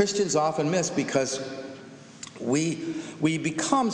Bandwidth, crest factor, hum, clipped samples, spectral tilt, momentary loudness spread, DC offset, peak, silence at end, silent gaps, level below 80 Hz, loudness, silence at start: 10.5 kHz; 20 dB; none; under 0.1%; -4.5 dB/octave; 17 LU; under 0.1%; -8 dBFS; 0 s; none; -68 dBFS; -26 LUFS; 0 s